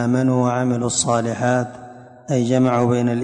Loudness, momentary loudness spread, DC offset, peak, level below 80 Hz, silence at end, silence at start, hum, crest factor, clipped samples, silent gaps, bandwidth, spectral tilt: -19 LUFS; 6 LU; under 0.1%; -6 dBFS; -54 dBFS; 0 s; 0 s; none; 14 dB; under 0.1%; none; 10.5 kHz; -5.5 dB/octave